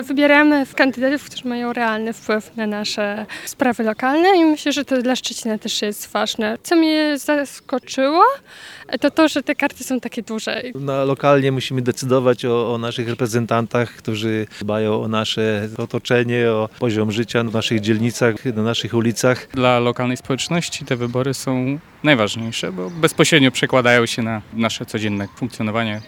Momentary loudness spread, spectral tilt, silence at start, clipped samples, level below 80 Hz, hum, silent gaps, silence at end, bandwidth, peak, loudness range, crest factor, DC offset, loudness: 10 LU; -5 dB/octave; 0 s; under 0.1%; -58 dBFS; none; none; 0 s; 18 kHz; 0 dBFS; 3 LU; 18 dB; under 0.1%; -19 LUFS